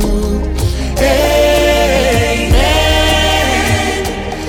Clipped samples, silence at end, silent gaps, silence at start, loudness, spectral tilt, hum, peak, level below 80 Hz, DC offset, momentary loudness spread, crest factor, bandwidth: under 0.1%; 0 s; none; 0 s; -12 LUFS; -4.5 dB/octave; none; -2 dBFS; -18 dBFS; 0.2%; 7 LU; 10 dB; 19 kHz